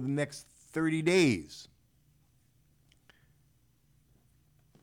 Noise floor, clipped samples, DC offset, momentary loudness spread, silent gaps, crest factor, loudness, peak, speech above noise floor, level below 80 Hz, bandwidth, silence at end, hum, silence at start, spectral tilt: -69 dBFS; under 0.1%; under 0.1%; 22 LU; none; 20 dB; -30 LUFS; -16 dBFS; 39 dB; -70 dBFS; 17 kHz; 3.15 s; none; 0 s; -5.5 dB/octave